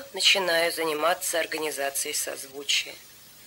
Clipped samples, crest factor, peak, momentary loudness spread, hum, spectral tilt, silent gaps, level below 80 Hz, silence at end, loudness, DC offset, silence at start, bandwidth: under 0.1%; 18 dB; -8 dBFS; 12 LU; none; 0 dB/octave; none; -72 dBFS; 0 s; -25 LUFS; under 0.1%; 0 s; 16.5 kHz